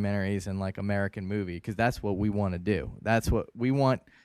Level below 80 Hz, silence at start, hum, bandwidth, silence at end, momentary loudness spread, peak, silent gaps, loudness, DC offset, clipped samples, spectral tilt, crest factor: -44 dBFS; 0 s; none; 14.5 kHz; 0.25 s; 7 LU; -10 dBFS; none; -29 LUFS; under 0.1%; under 0.1%; -7 dB/octave; 18 dB